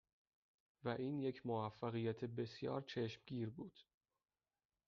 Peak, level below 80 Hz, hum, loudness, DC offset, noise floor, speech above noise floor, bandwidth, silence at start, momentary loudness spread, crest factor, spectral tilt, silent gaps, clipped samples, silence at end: -28 dBFS; -80 dBFS; none; -45 LUFS; under 0.1%; under -90 dBFS; over 45 dB; 7 kHz; 0.85 s; 6 LU; 18 dB; -6 dB/octave; none; under 0.1%; 1.05 s